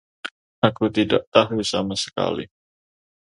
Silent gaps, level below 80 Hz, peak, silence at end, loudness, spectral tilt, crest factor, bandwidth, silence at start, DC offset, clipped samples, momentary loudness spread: 0.31-0.62 s, 1.27-1.32 s; -54 dBFS; 0 dBFS; 0.75 s; -21 LUFS; -5 dB/octave; 22 dB; 11 kHz; 0.25 s; under 0.1%; under 0.1%; 18 LU